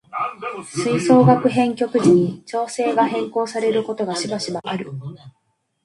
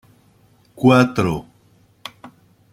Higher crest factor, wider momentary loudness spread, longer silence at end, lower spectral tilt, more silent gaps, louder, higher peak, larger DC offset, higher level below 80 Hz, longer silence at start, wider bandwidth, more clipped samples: about the same, 18 dB vs 20 dB; second, 13 LU vs 24 LU; about the same, 0.55 s vs 0.45 s; about the same, -6 dB/octave vs -7 dB/octave; neither; about the same, -19 LUFS vs -17 LUFS; about the same, 0 dBFS vs -2 dBFS; neither; second, -62 dBFS vs -52 dBFS; second, 0.15 s vs 0.75 s; second, 11.5 kHz vs 15 kHz; neither